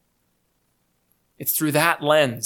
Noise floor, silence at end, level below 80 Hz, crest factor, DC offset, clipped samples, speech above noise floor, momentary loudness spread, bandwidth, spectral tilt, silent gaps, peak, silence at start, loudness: -69 dBFS; 0 s; -70 dBFS; 22 dB; under 0.1%; under 0.1%; 49 dB; 6 LU; 19 kHz; -3.5 dB/octave; none; -2 dBFS; 1.4 s; -20 LUFS